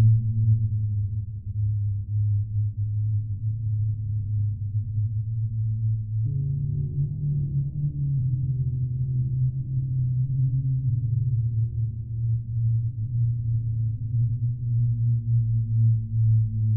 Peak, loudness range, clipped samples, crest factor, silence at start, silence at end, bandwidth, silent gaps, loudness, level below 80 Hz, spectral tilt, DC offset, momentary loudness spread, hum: -10 dBFS; 3 LU; under 0.1%; 14 dB; 0 s; 0 s; 0.5 kHz; none; -26 LUFS; -42 dBFS; -25.5 dB/octave; under 0.1%; 5 LU; none